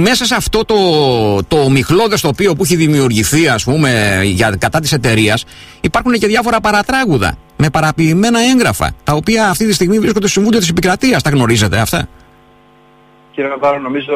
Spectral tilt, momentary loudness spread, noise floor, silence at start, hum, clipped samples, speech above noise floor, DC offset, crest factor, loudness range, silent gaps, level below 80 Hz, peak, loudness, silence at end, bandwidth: -4.5 dB/octave; 6 LU; -45 dBFS; 0 s; none; under 0.1%; 33 dB; under 0.1%; 12 dB; 2 LU; none; -34 dBFS; 0 dBFS; -12 LUFS; 0 s; 16 kHz